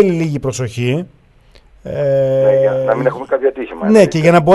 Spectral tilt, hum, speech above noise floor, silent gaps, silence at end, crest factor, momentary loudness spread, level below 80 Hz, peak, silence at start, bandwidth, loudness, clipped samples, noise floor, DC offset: -7 dB/octave; none; 33 dB; none; 0 s; 14 dB; 11 LU; -46 dBFS; 0 dBFS; 0 s; 12 kHz; -14 LUFS; under 0.1%; -46 dBFS; under 0.1%